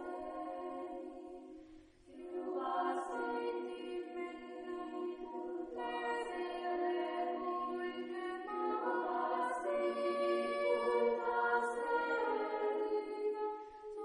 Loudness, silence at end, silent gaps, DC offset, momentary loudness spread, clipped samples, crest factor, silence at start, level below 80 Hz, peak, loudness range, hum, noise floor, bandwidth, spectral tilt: -38 LUFS; 0 s; none; under 0.1%; 12 LU; under 0.1%; 16 dB; 0 s; -72 dBFS; -22 dBFS; 7 LU; none; -59 dBFS; 10 kHz; -4 dB/octave